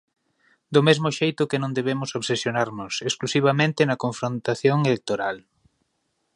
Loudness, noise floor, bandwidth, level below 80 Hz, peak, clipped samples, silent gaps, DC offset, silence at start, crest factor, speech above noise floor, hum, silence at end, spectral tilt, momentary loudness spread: -23 LUFS; -73 dBFS; 11 kHz; -66 dBFS; -2 dBFS; under 0.1%; none; under 0.1%; 0.7 s; 22 dB; 51 dB; none; 0.95 s; -5 dB/octave; 7 LU